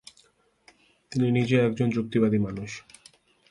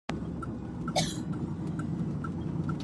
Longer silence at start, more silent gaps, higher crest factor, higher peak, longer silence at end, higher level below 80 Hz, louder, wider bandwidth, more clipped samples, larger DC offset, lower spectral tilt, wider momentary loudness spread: first, 1.1 s vs 0.1 s; neither; about the same, 18 dB vs 20 dB; first, -10 dBFS vs -14 dBFS; first, 0.7 s vs 0 s; second, -58 dBFS vs -50 dBFS; first, -25 LUFS vs -34 LUFS; about the same, 11.5 kHz vs 12.5 kHz; neither; neither; first, -7.5 dB/octave vs -5.5 dB/octave; first, 14 LU vs 6 LU